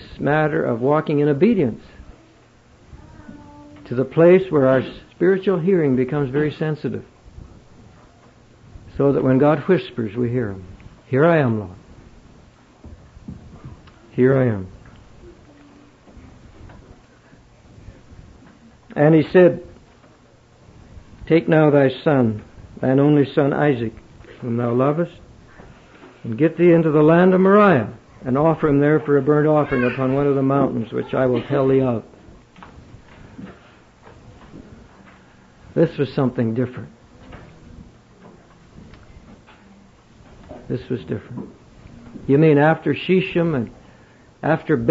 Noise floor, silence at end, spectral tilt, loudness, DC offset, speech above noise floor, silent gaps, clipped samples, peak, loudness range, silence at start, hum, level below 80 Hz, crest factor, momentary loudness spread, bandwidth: -51 dBFS; 0 s; -9.5 dB/octave; -18 LUFS; under 0.1%; 34 dB; none; under 0.1%; -4 dBFS; 10 LU; 0 s; none; -50 dBFS; 16 dB; 19 LU; 7.6 kHz